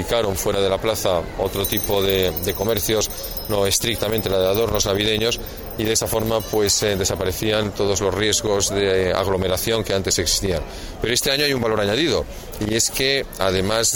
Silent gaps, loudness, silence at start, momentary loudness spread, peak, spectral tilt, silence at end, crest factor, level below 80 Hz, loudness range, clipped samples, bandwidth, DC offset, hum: none; -20 LUFS; 0 s; 6 LU; -4 dBFS; -3 dB/octave; 0 s; 16 dB; -36 dBFS; 1 LU; under 0.1%; 19 kHz; under 0.1%; none